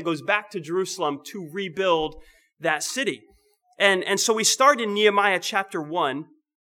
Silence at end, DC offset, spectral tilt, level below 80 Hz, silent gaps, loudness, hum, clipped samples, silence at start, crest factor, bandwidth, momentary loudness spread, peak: 0.4 s; under 0.1%; -2 dB/octave; -58 dBFS; none; -22 LUFS; none; under 0.1%; 0 s; 22 dB; 19 kHz; 13 LU; -2 dBFS